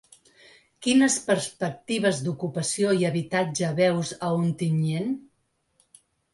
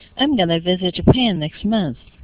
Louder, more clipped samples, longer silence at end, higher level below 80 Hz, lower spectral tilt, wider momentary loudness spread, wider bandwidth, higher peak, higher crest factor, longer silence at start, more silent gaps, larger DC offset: second, -25 LUFS vs -18 LUFS; neither; first, 1.1 s vs 0.3 s; second, -66 dBFS vs -36 dBFS; second, -5 dB/octave vs -10.5 dB/octave; about the same, 9 LU vs 7 LU; first, 11.5 kHz vs 4 kHz; second, -10 dBFS vs 0 dBFS; about the same, 16 dB vs 18 dB; first, 0.8 s vs 0.15 s; neither; neither